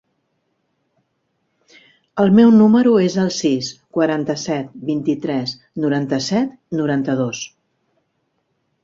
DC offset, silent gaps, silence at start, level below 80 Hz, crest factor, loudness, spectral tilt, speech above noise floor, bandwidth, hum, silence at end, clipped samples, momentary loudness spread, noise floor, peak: under 0.1%; none; 2.15 s; -60 dBFS; 16 dB; -17 LUFS; -6 dB/octave; 53 dB; 7.6 kHz; none; 1.35 s; under 0.1%; 13 LU; -69 dBFS; -2 dBFS